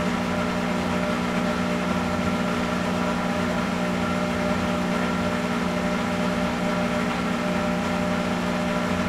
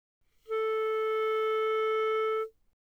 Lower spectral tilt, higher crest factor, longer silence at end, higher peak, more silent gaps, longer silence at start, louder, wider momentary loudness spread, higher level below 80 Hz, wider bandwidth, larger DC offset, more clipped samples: first, -5.5 dB/octave vs -1.5 dB/octave; first, 14 dB vs 8 dB; second, 0 s vs 0.35 s; first, -10 dBFS vs -22 dBFS; neither; second, 0 s vs 0.5 s; first, -24 LUFS vs -30 LUFS; second, 1 LU vs 6 LU; first, -44 dBFS vs -74 dBFS; first, 15 kHz vs 6 kHz; neither; neither